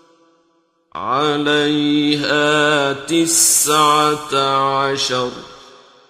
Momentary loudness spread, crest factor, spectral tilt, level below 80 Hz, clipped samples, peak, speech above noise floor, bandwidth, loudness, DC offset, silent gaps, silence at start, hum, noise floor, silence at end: 10 LU; 16 dB; -2.5 dB/octave; -56 dBFS; under 0.1%; 0 dBFS; 45 dB; 16 kHz; -15 LUFS; under 0.1%; none; 0.95 s; none; -61 dBFS; 0.5 s